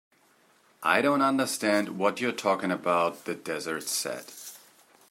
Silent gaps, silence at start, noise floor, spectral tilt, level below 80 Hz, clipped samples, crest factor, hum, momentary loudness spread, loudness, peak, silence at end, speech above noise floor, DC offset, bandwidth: none; 0.8 s; -63 dBFS; -3.5 dB/octave; -80 dBFS; under 0.1%; 22 dB; none; 13 LU; -27 LUFS; -8 dBFS; 0.55 s; 36 dB; under 0.1%; 16 kHz